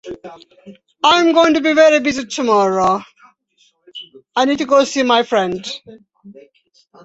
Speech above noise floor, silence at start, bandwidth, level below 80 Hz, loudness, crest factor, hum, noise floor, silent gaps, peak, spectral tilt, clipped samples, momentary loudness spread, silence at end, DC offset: 44 dB; 0.05 s; 8.2 kHz; -56 dBFS; -14 LUFS; 16 dB; none; -59 dBFS; none; 0 dBFS; -3.5 dB/octave; under 0.1%; 22 LU; 0.75 s; under 0.1%